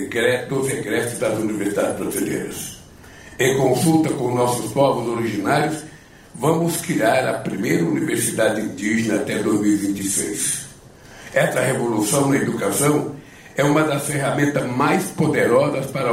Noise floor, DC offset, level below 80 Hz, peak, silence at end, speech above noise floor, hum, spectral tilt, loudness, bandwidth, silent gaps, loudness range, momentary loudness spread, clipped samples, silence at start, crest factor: -43 dBFS; under 0.1%; -54 dBFS; -6 dBFS; 0 s; 24 dB; none; -5 dB/octave; -20 LUFS; 16 kHz; none; 2 LU; 7 LU; under 0.1%; 0 s; 14 dB